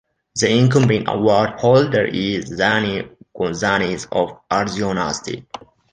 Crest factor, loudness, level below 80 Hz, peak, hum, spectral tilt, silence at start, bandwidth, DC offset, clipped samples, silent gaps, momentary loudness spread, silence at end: 16 dB; -18 LUFS; -48 dBFS; -2 dBFS; none; -5 dB/octave; 0.35 s; 9.6 kHz; under 0.1%; under 0.1%; none; 14 LU; 0.35 s